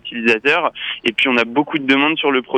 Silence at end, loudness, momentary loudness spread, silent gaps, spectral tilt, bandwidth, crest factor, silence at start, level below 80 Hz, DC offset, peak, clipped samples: 0 s; -16 LUFS; 5 LU; none; -4.5 dB/octave; 9.4 kHz; 14 dB; 0.05 s; -62 dBFS; under 0.1%; -2 dBFS; under 0.1%